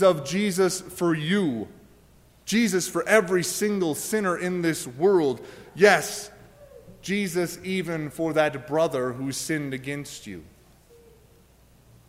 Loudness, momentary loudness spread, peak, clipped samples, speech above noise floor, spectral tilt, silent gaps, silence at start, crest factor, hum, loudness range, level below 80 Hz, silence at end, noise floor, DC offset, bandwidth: -24 LUFS; 15 LU; -4 dBFS; under 0.1%; 32 dB; -4.5 dB/octave; none; 0 s; 22 dB; none; 5 LU; -60 dBFS; 1.65 s; -56 dBFS; under 0.1%; 16 kHz